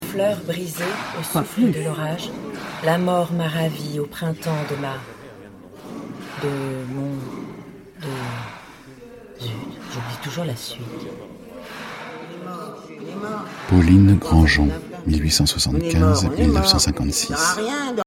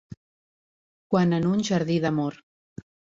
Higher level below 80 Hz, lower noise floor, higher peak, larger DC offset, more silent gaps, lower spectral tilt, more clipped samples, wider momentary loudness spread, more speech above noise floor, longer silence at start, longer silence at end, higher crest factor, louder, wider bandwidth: first, -32 dBFS vs -62 dBFS; second, -42 dBFS vs under -90 dBFS; first, -2 dBFS vs -8 dBFS; neither; second, none vs 0.17-1.10 s; second, -5 dB/octave vs -6.5 dB/octave; neither; first, 21 LU vs 6 LU; second, 22 dB vs over 67 dB; about the same, 0 s vs 0.1 s; second, 0.05 s vs 0.8 s; about the same, 20 dB vs 18 dB; first, -21 LUFS vs -24 LUFS; first, 16.5 kHz vs 7.6 kHz